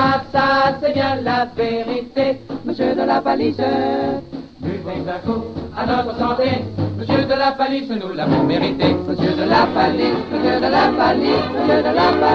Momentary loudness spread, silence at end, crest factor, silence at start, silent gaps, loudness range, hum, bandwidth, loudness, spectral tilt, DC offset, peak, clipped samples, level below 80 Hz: 9 LU; 0 s; 14 dB; 0 s; none; 5 LU; none; 7.2 kHz; -18 LUFS; -7.5 dB/octave; under 0.1%; -4 dBFS; under 0.1%; -46 dBFS